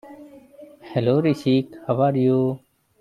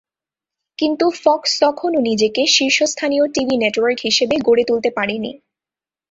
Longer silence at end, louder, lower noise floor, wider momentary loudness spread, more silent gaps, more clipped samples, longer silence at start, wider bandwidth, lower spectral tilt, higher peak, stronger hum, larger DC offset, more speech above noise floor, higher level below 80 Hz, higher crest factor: second, 0.45 s vs 0.75 s; second, -21 LUFS vs -16 LUFS; second, -46 dBFS vs under -90 dBFS; about the same, 7 LU vs 7 LU; neither; neither; second, 0.05 s vs 0.8 s; first, 11 kHz vs 8 kHz; first, -8.5 dB/octave vs -2.5 dB/octave; second, -6 dBFS vs -2 dBFS; neither; neither; second, 26 dB vs over 74 dB; second, -64 dBFS vs -58 dBFS; about the same, 16 dB vs 16 dB